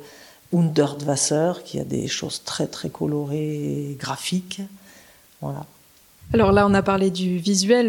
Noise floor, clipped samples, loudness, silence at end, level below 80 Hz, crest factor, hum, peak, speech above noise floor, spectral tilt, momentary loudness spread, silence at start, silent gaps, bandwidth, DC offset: -51 dBFS; under 0.1%; -22 LUFS; 0 s; -48 dBFS; 18 dB; none; -4 dBFS; 30 dB; -5 dB/octave; 15 LU; 0 s; none; 18.5 kHz; under 0.1%